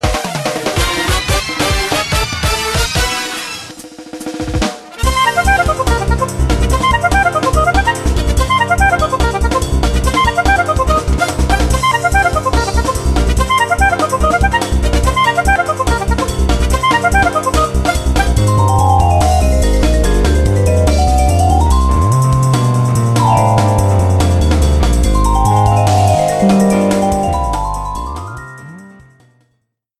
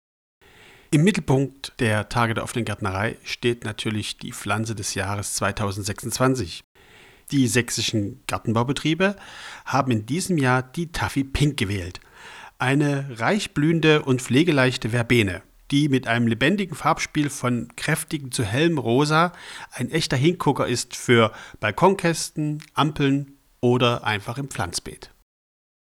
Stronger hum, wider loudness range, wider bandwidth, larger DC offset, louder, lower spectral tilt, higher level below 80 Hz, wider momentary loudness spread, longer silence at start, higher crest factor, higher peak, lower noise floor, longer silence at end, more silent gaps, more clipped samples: neither; about the same, 4 LU vs 5 LU; second, 14 kHz vs 16.5 kHz; neither; first, -13 LUFS vs -23 LUFS; about the same, -5 dB/octave vs -5 dB/octave; first, -18 dBFS vs -48 dBFS; about the same, 7 LU vs 9 LU; second, 0.05 s vs 0.9 s; second, 12 dB vs 20 dB; first, 0 dBFS vs -4 dBFS; first, -65 dBFS vs -51 dBFS; first, 1.1 s vs 0.9 s; second, none vs 6.64-6.75 s; neither